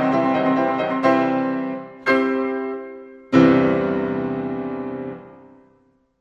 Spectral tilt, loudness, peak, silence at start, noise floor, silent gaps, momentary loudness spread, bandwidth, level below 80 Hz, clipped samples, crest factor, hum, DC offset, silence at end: -7.5 dB/octave; -20 LUFS; -4 dBFS; 0 s; -60 dBFS; none; 16 LU; 7 kHz; -54 dBFS; under 0.1%; 18 dB; none; under 0.1%; 0.85 s